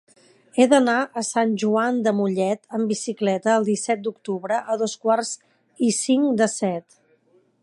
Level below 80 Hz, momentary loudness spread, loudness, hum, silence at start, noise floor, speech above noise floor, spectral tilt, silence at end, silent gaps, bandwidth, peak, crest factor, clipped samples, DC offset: -74 dBFS; 9 LU; -22 LUFS; none; 0.55 s; -61 dBFS; 40 dB; -4.5 dB/octave; 0.8 s; none; 11.5 kHz; -2 dBFS; 20 dB; under 0.1%; under 0.1%